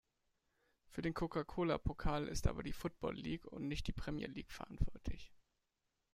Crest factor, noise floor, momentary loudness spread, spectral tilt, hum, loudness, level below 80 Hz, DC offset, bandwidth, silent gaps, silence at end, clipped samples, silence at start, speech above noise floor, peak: 20 dB; -87 dBFS; 11 LU; -6 dB/octave; none; -43 LUFS; -48 dBFS; under 0.1%; 15.5 kHz; none; 0.75 s; under 0.1%; 0.9 s; 46 dB; -22 dBFS